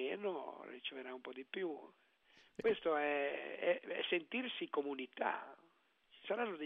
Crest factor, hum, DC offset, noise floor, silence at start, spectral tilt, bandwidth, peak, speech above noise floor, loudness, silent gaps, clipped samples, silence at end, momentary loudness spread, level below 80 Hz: 20 dB; none; under 0.1%; -73 dBFS; 0 s; -1 dB/octave; 5.8 kHz; -22 dBFS; 33 dB; -41 LUFS; none; under 0.1%; 0 s; 13 LU; -84 dBFS